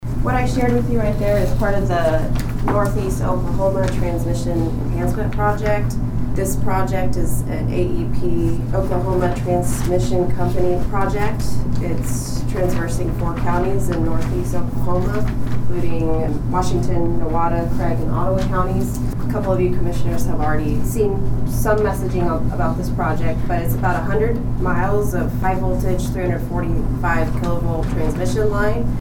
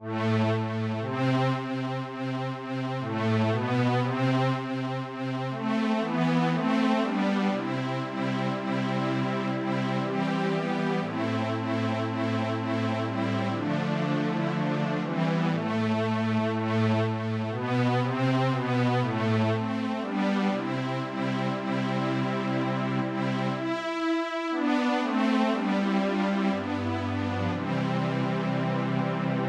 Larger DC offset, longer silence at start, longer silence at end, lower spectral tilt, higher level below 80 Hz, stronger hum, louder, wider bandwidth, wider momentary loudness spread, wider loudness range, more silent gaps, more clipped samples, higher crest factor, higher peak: neither; about the same, 0 s vs 0 s; about the same, 0 s vs 0 s; about the same, -7 dB/octave vs -7.5 dB/octave; first, -24 dBFS vs -70 dBFS; neither; first, -20 LUFS vs -28 LUFS; first, 17 kHz vs 10 kHz; about the same, 4 LU vs 5 LU; about the same, 2 LU vs 2 LU; neither; neither; about the same, 12 dB vs 14 dB; first, -4 dBFS vs -12 dBFS